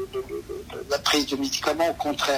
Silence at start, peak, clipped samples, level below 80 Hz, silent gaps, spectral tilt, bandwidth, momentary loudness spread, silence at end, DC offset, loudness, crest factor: 0 s; -6 dBFS; under 0.1%; -50 dBFS; none; -2.5 dB/octave; 16 kHz; 13 LU; 0 s; under 0.1%; -25 LUFS; 20 dB